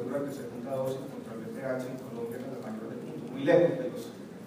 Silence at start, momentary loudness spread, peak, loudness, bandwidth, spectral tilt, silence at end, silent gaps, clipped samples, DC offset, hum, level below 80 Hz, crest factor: 0 s; 16 LU; -10 dBFS; -33 LUFS; 15.5 kHz; -7 dB/octave; 0 s; none; under 0.1%; under 0.1%; none; -74 dBFS; 22 dB